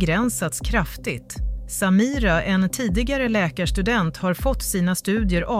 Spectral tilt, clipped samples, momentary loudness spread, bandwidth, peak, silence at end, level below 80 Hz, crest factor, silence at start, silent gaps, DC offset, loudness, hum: -5 dB/octave; under 0.1%; 9 LU; 16 kHz; -8 dBFS; 0 s; -30 dBFS; 14 dB; 0 s; none; under 0.1%; -22 LUFS; none